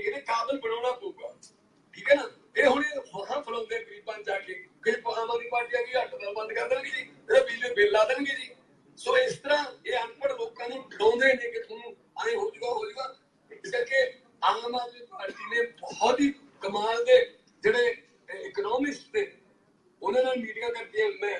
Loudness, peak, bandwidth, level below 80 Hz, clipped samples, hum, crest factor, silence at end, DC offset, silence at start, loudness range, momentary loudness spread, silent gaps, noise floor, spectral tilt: -28 LUFS; -8 dBFS; 10.5 kHz; -70 dBFS; under 0.1%; none; 20 dB; 0 s; under 0.1%; 0 s; 4 LU; 14 LU; none; -64 dBFS; -3 dB/octave